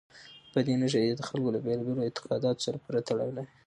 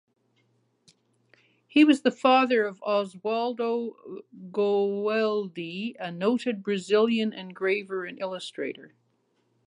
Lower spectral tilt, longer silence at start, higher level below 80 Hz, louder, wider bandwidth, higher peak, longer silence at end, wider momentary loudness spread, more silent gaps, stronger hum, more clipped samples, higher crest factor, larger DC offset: about the same, -6 dB/octave vs -5.5 dB/octave; second, 0.15 s vs 1.75 s; first, -70 dBFS vs -80 dBFS; second, -30 LUFS vs -26 LUFS; about the same, 11 kHz vs 11 kHz; second, -14 dBFS vs -8 dBFS; second, 0.2 s vs 0.8 s; second, 6 LU vs 14 LU; neither; neither; neither; about the same, 18 dB vs 20 dB; neither